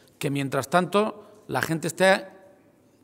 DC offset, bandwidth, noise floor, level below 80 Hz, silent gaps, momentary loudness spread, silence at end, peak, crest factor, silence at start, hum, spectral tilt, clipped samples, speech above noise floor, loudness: under 0.1%; 16 kHz; -58 dBFS; -68 dBFS; none; 9 LU; 0.75 s; -4 dBFS; 22 dB; 0.2 s; none; -5 dB/octave; under 0.1%; 34 dB; -25 LUFS